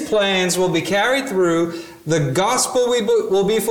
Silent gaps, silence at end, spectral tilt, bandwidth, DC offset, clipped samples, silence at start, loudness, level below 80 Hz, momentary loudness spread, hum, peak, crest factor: none; 0 s; -4 dB/octave; 19 kHz; under 0.1%; under 0.1%; 0 s; -18 LUFS; -52 dBFS; 4 LU; none; -6 dBFS; 12 dB